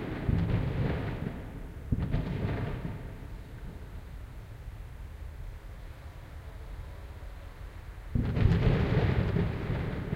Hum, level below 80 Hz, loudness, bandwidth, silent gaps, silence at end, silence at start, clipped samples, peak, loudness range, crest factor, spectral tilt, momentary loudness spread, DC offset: none; -38 dBFS; -31 LUFS; 15.5 kHz; none; 0 s; 0 s; under 0.1%; -12 dBFS; 15 LU; 22 dB; -8.5 dB/octave; 19 LU; under 0.1%